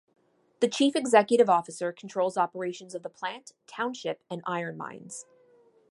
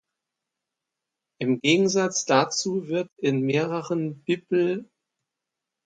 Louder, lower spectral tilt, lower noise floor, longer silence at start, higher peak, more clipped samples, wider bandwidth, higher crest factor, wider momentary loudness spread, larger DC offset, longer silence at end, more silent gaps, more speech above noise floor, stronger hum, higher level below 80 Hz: second, -27 LUFS vs -24 LUFS; about the same, -4 dB/octave vs -4.5 dB/octave; second, -61 dBFS vs -86 dBFS; second, 0.6 s vs 1.4 s; about the same, -8 dBFS vs -6 dBFS; neither; first, 11.5 kHz vs 9.4 kHz; about the same, 22 dB vs 20 dB; first, 18 LU vs 8 LU; neither; second, 0.7 s vs 1 s; second, none vs 3.12-3.16 s; second, 33 dB vs 62 dB; neither; second, -82 dBFS vs -74 dBFS